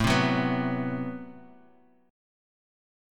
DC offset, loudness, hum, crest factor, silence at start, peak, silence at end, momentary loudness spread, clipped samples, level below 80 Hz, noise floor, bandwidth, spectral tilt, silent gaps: under 0.1%; -28 LUFS; none; 20 dB; 0 s; -10 dBFS; 1.65 s; 17 LU; under 0.1%; -50 dBFS; -60 dBFS; 16 kHz; -5.5 dB/octave; none